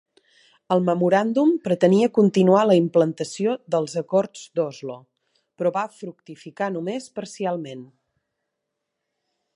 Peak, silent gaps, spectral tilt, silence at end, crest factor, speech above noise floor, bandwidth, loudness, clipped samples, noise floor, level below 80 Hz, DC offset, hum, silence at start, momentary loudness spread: -4 dBFS; none; -6.5 dB/octave; 1.7 s; 20 dB; 59 dB; 11 kHz; -21 LUFS; under 0.1%; -81 dBFS; -72 dBFS; under 0.1%; none; 0.7 s; 19 LU